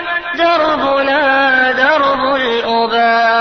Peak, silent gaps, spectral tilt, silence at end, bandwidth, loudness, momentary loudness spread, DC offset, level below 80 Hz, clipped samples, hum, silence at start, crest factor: 0 dBFS; none; -4 dB/octave; 0 s; 6.4 kHz; -12 LUFS; 4 LU; 0.2%; -48 dBFS; under 0.1%; none; 0 s; 12 dB